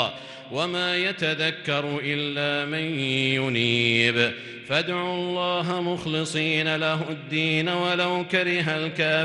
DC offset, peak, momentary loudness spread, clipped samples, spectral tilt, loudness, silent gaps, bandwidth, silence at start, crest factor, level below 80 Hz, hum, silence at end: under 0.1%; -4 dBFS; 6 LU; under 0.1%; -5 dB/octave; -24 LUFS; none; 11.5 kHz; 0 s; 20 dB; -66 dBFS; none; 0 s